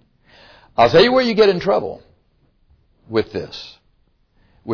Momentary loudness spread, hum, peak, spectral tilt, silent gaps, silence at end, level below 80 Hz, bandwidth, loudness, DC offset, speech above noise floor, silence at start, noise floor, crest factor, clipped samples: 21 LU; none; -2 dBFS; -6 dB/octave; none; 0 s; -50 dBFS; 5.4 kHz; -16 LUFS; under 0.1%; 44 dB; 0.8 s; -60 dBFS; 18 dB; under 0.1%